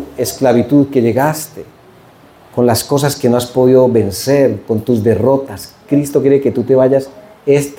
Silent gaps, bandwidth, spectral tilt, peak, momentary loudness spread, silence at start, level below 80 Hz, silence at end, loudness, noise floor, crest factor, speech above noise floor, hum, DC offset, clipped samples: none; 17 kHz; -6 dB/octave; 0 dBFS; 11 LU; 0 s; -50 dBFS; 0.05 s; -13 LUFS; -42 dBFS; 12 dB; 30 dB; none; under 0.1%; under 0.1%